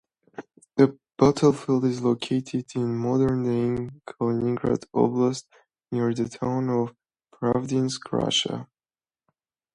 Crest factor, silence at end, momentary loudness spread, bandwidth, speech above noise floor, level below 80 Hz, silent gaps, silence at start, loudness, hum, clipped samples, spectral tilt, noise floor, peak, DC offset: 20 dB; 1.1 s; 10 LU; 11 kHz; over 66 dB; -56 dBFS; none; 0.4 s; -25 LUFS; none; under 0.1%; -6 dB/octave; under -90 dBFS; -6 dBFS; under 0.1%